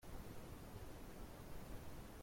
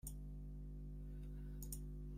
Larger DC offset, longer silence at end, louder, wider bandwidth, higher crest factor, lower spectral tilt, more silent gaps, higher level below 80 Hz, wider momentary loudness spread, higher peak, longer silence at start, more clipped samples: neither; about the same, 0 s vs 0 s; second, -56 LUFS vs -52 LUFS; about the same, 16.5 kHz vs 16 kHz; about the same, 14 dB vs 16 dB; about the same, -5.5 dB/octave vs -6 dB/octave; neither; second, -58 dBFS vs -50 dBFS; about the same, 1 LU vs 3 LU; second, -38 dBFS vs -34 dBFS; about the same, 0 s vs 0.05 s; neither